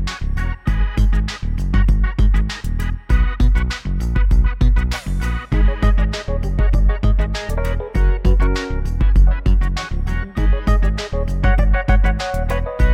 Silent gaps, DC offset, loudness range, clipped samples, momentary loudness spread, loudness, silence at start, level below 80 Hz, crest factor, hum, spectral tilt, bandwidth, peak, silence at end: none; under 0.1%; 1 LU; under 0.1%; 7 LU; -19 LUFS; 0 s; -16 dBFS; 12 dB; none; -6.5 dB/octave; 8.4 kHz; -2 dBFS; 0 s